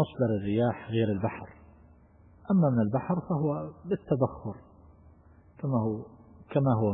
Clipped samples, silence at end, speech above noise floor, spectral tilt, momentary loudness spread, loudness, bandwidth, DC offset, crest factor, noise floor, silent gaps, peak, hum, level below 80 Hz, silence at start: under 0.1%; 0 s; 29 dB; -12.5 dB/octave; 16 LU; -29 LUFS; 3.9 kHz; under 0.1%; 18 dB; -57 dBFS; none; -12 dBFS; none; -58 dBFS; 0 s